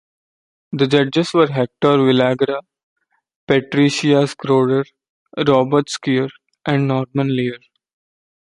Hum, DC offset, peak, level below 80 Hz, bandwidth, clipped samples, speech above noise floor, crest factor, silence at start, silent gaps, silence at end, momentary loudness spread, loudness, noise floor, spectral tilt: none; under 0.1%; -2 dBFS; -60 dBFS; 11.5 kHz; under 0.1%; over 74 dB; 16 dB; 0.7 s; 2.83-2.96 s, 3.35-3.47 s, 5.09-5.26 s; 0.95 s; 12 LU; -17 LUFS; under -90 dBFS; -6 dB/octave